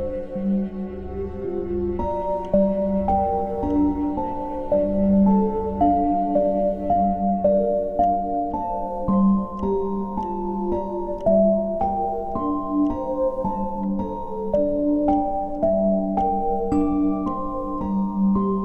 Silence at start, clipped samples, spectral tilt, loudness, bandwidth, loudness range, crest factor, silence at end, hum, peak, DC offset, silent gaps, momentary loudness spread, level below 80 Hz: 0 s; under 0.1%; -11.5 dB/octave; -23 LUFS; 3.9 kHz; 3 LU; 16 dB; 0 s; none; -6 dBFS; under 0.1%; none; 8 LU; -38 dBFS